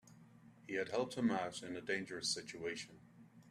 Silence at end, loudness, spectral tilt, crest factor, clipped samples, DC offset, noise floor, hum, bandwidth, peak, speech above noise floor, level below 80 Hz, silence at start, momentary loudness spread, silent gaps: 0 s; -41 LUFS; -3.5 dB/octave; 20 dB; under 0.1%; under 0.1%; -62 dBFS; none; 13.5 kHz; -24 dBFS; 22 dB; -78 dBFS; 0.05 s; 10 LU; none